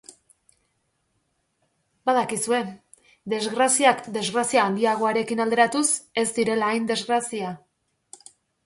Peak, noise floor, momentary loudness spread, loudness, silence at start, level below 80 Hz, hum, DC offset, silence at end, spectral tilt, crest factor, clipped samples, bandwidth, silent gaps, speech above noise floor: -6 dBFS; -72 dBFS; 11 LU; -23 LUFS; 2.05 s; -70 dBFS; none; under 0.1%; 1.1 s; -2.5 dB/octave; 20 dB; under 0.1%; 12 kHz; none; 50 dB